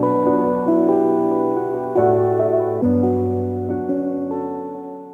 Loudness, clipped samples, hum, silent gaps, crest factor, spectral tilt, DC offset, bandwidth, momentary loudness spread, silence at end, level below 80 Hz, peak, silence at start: -19 LUFS; under 0.1%; none; none; 12 dB; -11 dB/octave; under 0.1%; 3.5 kHz; 9 LU; 0 s; -56 dBFS; -6 dBFS; 0 s